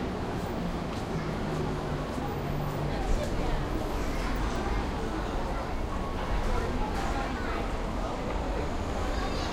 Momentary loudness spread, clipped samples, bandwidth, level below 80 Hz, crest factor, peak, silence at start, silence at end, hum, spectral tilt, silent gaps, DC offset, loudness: 2 LU; under 0.1%; 16 kHz; -34 dBFS; 16 dB; -16 dBFS; 0 s; 0 s; none; -6 dB/octave; none; under 0.1%; -33 LUFS